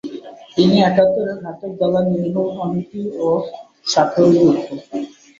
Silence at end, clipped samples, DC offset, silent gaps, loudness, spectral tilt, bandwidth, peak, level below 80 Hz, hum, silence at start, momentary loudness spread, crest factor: 0.3 s; under 0.1%; under 0.1%; none; -17 LUFS; -6.5 dB/octave; 7.6 kHz; 0 dBFS; -56 dBFS; none; 0.05 s; 15 LU; 16 dB